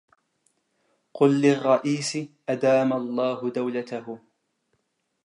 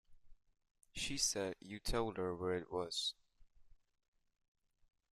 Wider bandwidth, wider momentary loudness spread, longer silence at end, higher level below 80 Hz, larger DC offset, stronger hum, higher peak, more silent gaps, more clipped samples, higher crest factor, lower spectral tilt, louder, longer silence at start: second, 11 kHz vs 14 kHz; first, 14 LU vs 9 LU; second, 1.05 s vs 1.45 s; second, -80 dBFS vs -58 dBFS; neither; neither; first, -6 dBFS vs -22 dBFS; second, none vs 0.71-0.75 s; neither; about the same, 20 dB vs 22 dB; first, -5.5 dB/octave vs -2.5 dB/octave; first, -24 LUFS vs -40 LUFS; first, 1.15 s vs 0.1 s